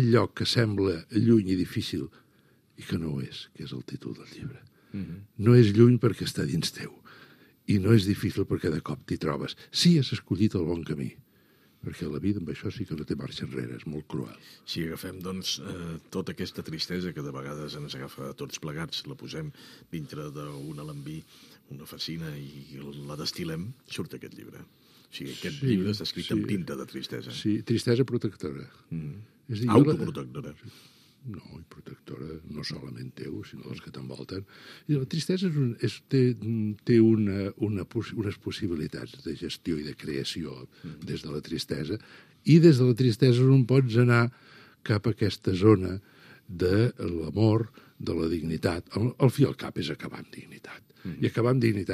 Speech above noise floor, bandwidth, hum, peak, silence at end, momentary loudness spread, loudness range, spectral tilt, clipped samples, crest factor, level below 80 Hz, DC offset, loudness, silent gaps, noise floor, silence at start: 35 dB; 14.5 kHz; none; -6 dBFS; 0 s; 20 LU; 14 LU; -7 dB/octave; under 0.1%; 22 dB; -58 dBFS; under 0.1%; -27 LUFS; none; -63 dBFS; 0 s